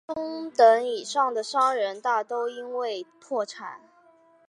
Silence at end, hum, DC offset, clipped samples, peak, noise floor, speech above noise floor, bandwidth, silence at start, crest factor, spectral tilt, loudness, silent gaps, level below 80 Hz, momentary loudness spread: 0.7 s; none; under 0.1%; under 0.1%; -6 dBFS; -58 dBFS; 33 dB; 11 kHz; 0.1 s; 20 dB; -2 dB/octave; -25 LUFS; none; -76 dBFS; 15 LU